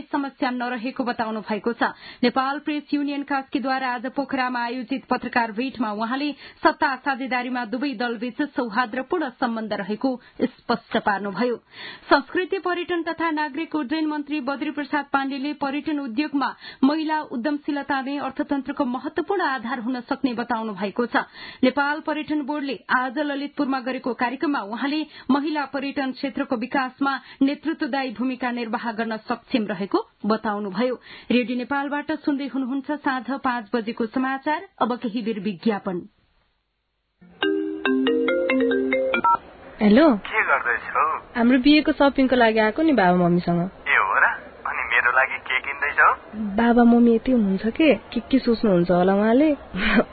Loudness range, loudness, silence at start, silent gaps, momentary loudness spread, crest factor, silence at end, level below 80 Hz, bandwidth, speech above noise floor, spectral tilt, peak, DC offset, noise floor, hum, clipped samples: 7 LU; -23 LUFS; 0 s; none; 9 LU; 18 dB; 0 s; -52 dBFS; 4.8 kHz; 51 dB; -10.5 dB/octave; -4 dBFS; under 0.1%; -74 dBFS; none; under 0.1%